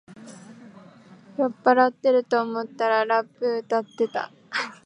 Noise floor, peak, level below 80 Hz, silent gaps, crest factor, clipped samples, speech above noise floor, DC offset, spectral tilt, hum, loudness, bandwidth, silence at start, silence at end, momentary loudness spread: -49 dBFS; -4 dBFS; -80 dBFS; none; 20 dB; under 0.1%; 26 dB; under 0.1%; -4.5 dB/octave; none; -23 LUFS; 10 kHz; 0.1 s; 0.1 s; 12 LU